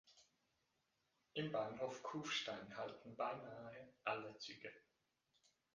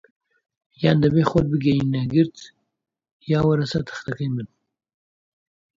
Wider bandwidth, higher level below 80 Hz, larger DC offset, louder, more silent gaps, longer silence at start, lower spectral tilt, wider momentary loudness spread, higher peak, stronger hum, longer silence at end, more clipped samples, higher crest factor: first, 9.6 kHz vs 7.6 kHz; second, -86 dBFS vs -48 dBFS; neither; second, -48 LUFS vs -21 LUFS; second, none vs 3.12-3.20 s; second, 0.05 s vs 0.8 s; second, -4 dB/octave vs -8 dB/octave; about the same, 12 LU vs 12 LU; second, -26 dBFS vs -2 dBFS; neither; second, 0.95 s vs 1.35 s; neither; about the same, 24 dB vs 20 dB